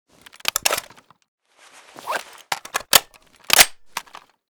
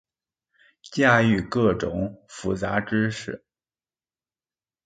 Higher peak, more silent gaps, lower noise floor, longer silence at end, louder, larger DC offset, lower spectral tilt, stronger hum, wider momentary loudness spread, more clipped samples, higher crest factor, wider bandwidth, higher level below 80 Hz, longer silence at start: about the same, 0 dBFS vs -2 dBFS; first, 1.28-1.38 s vs none; second, -50 dBFS vs under -90 dBFS; second, 0.5 s vs 1.5 s; first, -18 LUFS vs -23 LUFS; neither; second, 1.5 dB/octave vs -6 dB/octave; neither; first, 20 LU vs 15 LU; neither; about the same, 24 dB vs 24 dB; first, over 20 kHz vs 9.2 kHz; about the same, -54 dBFS vs -50 dBFS; second, 0.55 s vs 0.85 s